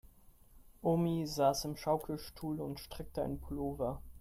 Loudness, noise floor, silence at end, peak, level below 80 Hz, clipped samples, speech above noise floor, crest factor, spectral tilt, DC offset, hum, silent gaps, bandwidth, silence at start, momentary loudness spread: -37 LUFS; -61 dBFS; 0 s; -18 dBFS; -54 dBFS; under 0.1%; 25 dB; 20 dB; -6 dB/octave; under 0.1%; none; none; 16 kHz; 0.2 s; 11 LU